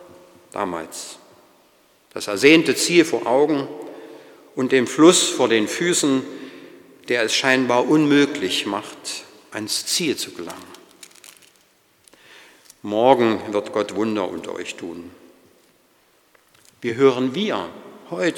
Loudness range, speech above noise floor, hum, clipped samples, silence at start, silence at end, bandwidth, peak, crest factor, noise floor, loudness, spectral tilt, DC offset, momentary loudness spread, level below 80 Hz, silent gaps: 9 LU; 40 dB; none; under 0.1%; 0 s; 0 s; 18.5 kHz; 0 dBFS; 22 dB; -59 dBFS; -19 LUFS; -3.5 dB/octave; under 0.1%; 21 LU; -70 dBFS; none